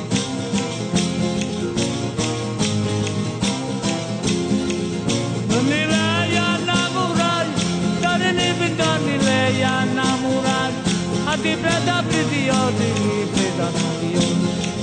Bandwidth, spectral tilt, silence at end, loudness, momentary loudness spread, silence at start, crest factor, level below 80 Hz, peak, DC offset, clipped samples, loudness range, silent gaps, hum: 9.4 kHz; -4.5 dB/octave; 0 s; -20 LUFS; 5 LU; 0 s; 14 dB; -48 dBFS; -6 dBFS; under 0.1%; under 0.1%; 3 LU; none; none